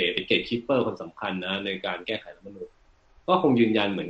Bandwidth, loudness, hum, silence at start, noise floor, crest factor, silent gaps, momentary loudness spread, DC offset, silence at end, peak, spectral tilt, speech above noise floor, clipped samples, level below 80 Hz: 7.8 kHz; -26 LUFS; none; 0 s; -59 dBFS; 18 dB; none; 21 LU; under 0.1%; 0 s; -8 dBFS; -7 dB/octave; 33 dB; under 0.1%; -60 dBFS